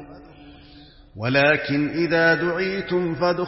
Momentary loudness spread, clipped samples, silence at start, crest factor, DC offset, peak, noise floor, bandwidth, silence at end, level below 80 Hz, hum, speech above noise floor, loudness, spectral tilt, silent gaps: 7 LU; under 0.1%; 0 s; 16 dB; under 0.1%; -6 dBFS; -47 dBFS; 6 kHz; 0 s; -52 dBFS; none; 26 dB; -21 LUFS; -9 dB/octave; none